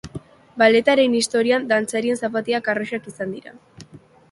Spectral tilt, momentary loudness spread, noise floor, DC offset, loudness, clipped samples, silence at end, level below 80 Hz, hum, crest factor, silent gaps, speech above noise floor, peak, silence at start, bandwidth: -3.5 dB/octave; 19 LU; -46 dBFS; under 0.1%; -20 LUFS; under 0.1%; 0.35 s; -58 dBFS; none; 20 dB; none; 26 dB; -2 dBFS; 0.05 s; 11.5 kHz